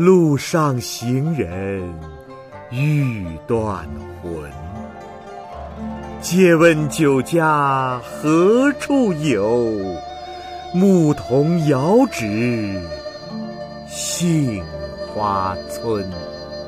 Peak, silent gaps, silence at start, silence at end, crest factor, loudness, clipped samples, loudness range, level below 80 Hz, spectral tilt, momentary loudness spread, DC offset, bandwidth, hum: -2 dBFS; none; 0 s; 0 s; 18 dB; -18 LUFS; under 0.1%; 9 LU; -44 dBFS; -6 dB/octave; 18 LU; under 0.1%; 15.5 kHz; none